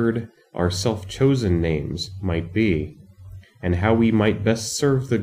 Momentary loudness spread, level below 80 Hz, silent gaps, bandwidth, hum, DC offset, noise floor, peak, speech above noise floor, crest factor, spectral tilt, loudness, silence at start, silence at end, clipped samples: 10 LU; -42 dBFS; none; 15.5 kHz; none; under 0.1%; -42 dBFS; -6 dBFS; 21 dB; 16 dB; -6 dB/octave; -22 LUFS; 0 s; 0 s; under 0.1%